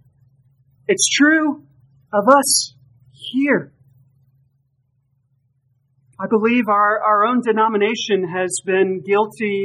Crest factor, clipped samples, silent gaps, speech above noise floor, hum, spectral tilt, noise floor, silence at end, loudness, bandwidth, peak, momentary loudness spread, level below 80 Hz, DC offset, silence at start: 20 dB; under 0.1%; none; 49 dB; none; -3 dB/octave; -65 dBFS; 0 s; -17 LUFS; 14.5 kHz; 0 dBFS; 10 LU; -72 dBFS; under 0.1%; 0.9 s